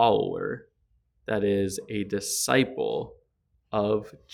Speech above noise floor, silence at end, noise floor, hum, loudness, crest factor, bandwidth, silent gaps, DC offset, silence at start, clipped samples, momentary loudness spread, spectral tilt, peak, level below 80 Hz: 45 dB; 0.25 s; -71 dBFS; none; -27 LUFS; 22 dB; 18.5 kHz; none; under 0.1%; 0 s; under 0.1%; 11 LU; -4 dB/octave; -6 dBFS; -60 dBFS